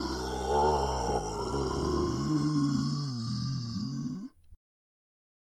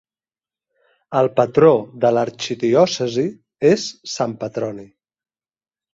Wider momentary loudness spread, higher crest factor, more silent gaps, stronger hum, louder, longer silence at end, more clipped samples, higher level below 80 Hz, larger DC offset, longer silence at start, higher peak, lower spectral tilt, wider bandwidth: second, 8 LU vs 12 LU; about the same, 16 dB vs 18 dB; neither; neither; second, -31 LUFS vs -18 LUFS; about the same, 1 s vs 1.1 s; neither; first, -44 dBFS vs -62 dBFS; neither; second, 0 s vs 1.1 s; second, -16 dBFS vs -2 dBFS; about the same, -6 dB/octave vs -5.5 dB/octave; first, 13.5 kHz vs 7.8 kHz